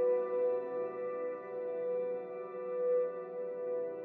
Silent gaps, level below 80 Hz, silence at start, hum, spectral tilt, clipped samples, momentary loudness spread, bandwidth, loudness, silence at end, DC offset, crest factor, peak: none; under -90 dBFS; 0 s; none; -6.5 dB/octave; under 0.1%; 8 LU; 3.6 kHz; -36 LUFS; 0 s; under 0.1%; 12 dB; -24 dBFS